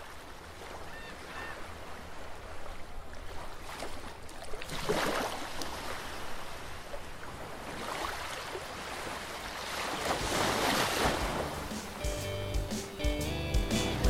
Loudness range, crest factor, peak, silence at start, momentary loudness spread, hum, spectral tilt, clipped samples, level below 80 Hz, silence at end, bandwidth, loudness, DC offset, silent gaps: 12 LU; 20 dB; -16 dBFS; 0 s; 16 LU; none; -3.5 dB/octave; under 0.1%; -44 dBFS; 0 s; 16 kHz; -36 LUFS; under 0.1%; none